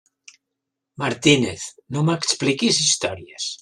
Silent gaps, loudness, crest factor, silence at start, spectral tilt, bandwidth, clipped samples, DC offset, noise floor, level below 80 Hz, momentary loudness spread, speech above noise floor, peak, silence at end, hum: none; -20 LUFS; 20 dB; 1 s; -3.5 dB/octave; 12.5 kHz; under 0.1%; under 0.1%; -82 dBFS; -58 dBFS; 12 LU; 61 dB; -2 dBFS; 0.05 s; none